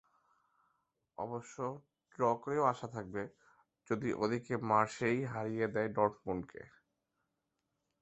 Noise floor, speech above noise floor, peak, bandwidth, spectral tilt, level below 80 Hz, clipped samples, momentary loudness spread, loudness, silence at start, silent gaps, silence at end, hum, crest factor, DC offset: -85 dBFS; 50 dB; -14 dBFS; 8 kHz; -6 dB/octave; -70 dBFS; under 0.1%; 13 LU; -36 LUFS; 1.2 s; none; 1.35 s; none; 24 dB; under 0.1%